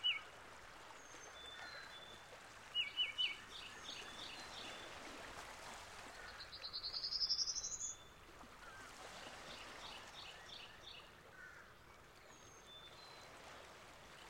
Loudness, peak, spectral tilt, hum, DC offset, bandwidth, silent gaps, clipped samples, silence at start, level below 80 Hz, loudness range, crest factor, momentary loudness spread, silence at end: -46 LUFS; -26 dBFS; 0 dB/octave; none; under 0.1%; 16 kHz; none; under 0.1%; 0 s; -70 dBFS; 13 LU; 24 dB; 19 LU; 0 s